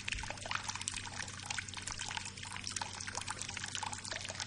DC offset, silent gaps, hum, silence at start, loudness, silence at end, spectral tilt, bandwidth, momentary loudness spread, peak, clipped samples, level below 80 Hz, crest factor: under 0.1%; none; none; 0 s; -40 LUFS; 0 s; -1 dB/octave; 11.5 kHz; 3 LU; -14 dBFS; under 0.1%; -58 dBFS; 28 dB